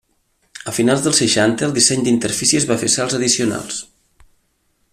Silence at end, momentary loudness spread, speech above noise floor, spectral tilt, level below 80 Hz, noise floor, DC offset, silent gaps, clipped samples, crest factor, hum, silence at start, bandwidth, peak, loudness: 1.1 s; 11 LU; 48 dB; -3 dB/octave; -54 dBFS; -64 dBFS; under 0.1%; none; under 0.1%; 18 dB; none; 0.55 s; 15 kHz; 0 dBFS; -16 LUFS